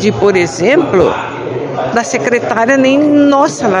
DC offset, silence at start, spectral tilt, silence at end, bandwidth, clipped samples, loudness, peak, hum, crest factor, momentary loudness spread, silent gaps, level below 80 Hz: under 0.1%; 0 s; -5 dB/octave; 0 s; 10.5 kHz; 0.3%; -11 LUFS; 0 dBFS; none; 10 dB; 10 LU; none; -46 dBFS